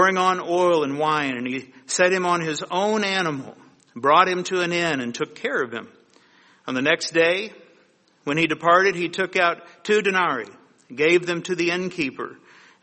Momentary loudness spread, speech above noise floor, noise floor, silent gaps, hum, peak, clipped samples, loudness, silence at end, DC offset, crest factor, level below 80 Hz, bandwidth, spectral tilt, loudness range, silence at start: 14 LU; 37 dB; -59 dBFS; none; none; -2 dBFS; under 0.1%; -21 LUFS; 0.5 s; under 0.1%; 20 dB; -68 dBFS; 8.8 kHz; -4 dB/octave; 3 LU; 0 s